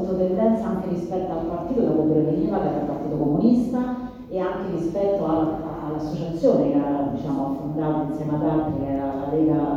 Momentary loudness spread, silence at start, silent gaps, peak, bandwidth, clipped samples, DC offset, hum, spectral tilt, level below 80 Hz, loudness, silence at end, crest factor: 8 LU; 0 s; none; -6 dBFS; 7.4 kHz; under 0.1%; under 0.1%; none; -9.5 dB/octave; -46 dBFS; -23 LUFS; 0 s; 16 dB